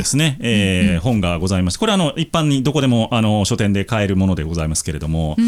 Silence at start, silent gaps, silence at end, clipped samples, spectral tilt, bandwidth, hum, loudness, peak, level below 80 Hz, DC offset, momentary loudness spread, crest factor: 0 s; none; 0 s; under 0.1%; -5 dB/octave; 15.5 kHz; none; -17 LUFS; -4 dBFS; -36 dBFS; under 0.1%; 4 LU; 12 dB